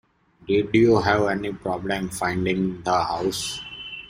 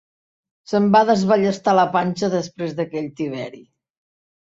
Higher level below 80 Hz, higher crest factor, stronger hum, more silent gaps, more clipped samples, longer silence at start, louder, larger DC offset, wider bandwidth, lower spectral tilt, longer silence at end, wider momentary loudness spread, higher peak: first, -50 dBFS vs -62 dBFS; about the same, 20 dB vs 18 dB; neither; neither; neither; second, 0.45 s vs 0.7 s; second, -23 LUFS vs -19 LUFS; neither; first, 15.5 kHz vs 7.8 kHz; second, -5 dB/octave vs -6.5 dB/octave; second, 0 s vs 0.8 s; about the same, 11 LU vs 12 LU; about the same, -4 dBFS vs -4 dBFS